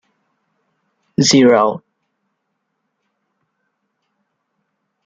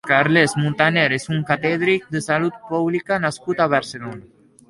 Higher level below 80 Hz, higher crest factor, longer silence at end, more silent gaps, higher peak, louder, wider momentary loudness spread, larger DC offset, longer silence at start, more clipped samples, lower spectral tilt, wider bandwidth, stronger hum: about the same, -62 dBFS vs -58 dBFS; about the same, 18 dB vs 18 dB; first, 3.25 s vs 0.5 s; neither; about the same, -2 dBFS vs -2 dBFS; first, -13 LUFS vs -19 LUFS; first, 16 LU vs 7 LU; neither; first, 1.2 s vs 0.05 s; neither; second, -4 dB/octave vs -5.5 dB/octave; second, 9.2 kHz vs 11.5 kHz; neither